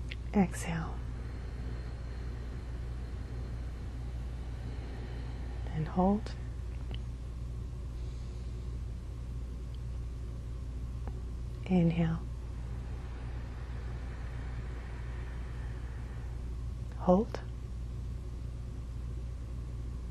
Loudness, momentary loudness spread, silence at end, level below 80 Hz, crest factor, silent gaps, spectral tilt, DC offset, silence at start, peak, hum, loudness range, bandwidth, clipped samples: -38 LUFS; 12 LU; 0 s; -40 dBFS; 24 dB; none; -7.5 dB/octave; under 0.1%; 0 s; -12 dBFS; none; 6 LU; 12 kHz; under 0.1%